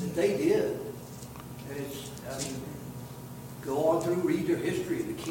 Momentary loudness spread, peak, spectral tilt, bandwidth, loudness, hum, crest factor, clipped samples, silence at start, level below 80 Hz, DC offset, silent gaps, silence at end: 16 LU; -14 dBFS; -5.5 dB/octave; 17 kHz; -31 LUFS; none; 16 dB; under 0.1%; 0 s; -58 dBFS; under 0.1%; none; 0 s